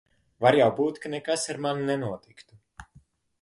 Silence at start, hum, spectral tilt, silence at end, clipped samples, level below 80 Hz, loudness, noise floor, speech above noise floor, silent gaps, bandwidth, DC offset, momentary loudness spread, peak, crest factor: 0.4 s; none; -4.5 dB/octave; 0.6 s; under 0.1%; -62 dBFS; -26 LUFS; -59 dBFS; 34 dB; none; 11.5 kHz; under 0.1%; 13 LU; -6 dBFS; 22 dB